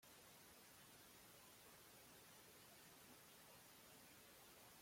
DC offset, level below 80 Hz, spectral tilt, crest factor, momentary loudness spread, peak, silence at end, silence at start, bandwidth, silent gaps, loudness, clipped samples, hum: under 0.1%; -88 dBFS; -2 dB/octave; 14 dB; 0 LU; -52 dBFS; 0 s; 0 s; 16.5 kHz; none; -64 LUFS; under 0.1%; none